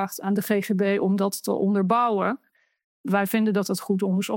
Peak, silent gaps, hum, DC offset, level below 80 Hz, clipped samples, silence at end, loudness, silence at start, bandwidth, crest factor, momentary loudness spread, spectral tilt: -8 dBFS; 2.84-3.04 s; none; under 0.1%; -80 dBFS; under 0.1%; 0 s; -24 LUFS; 0 s; 17 kHz; 16 dB; 5 LU; -6 dB/octave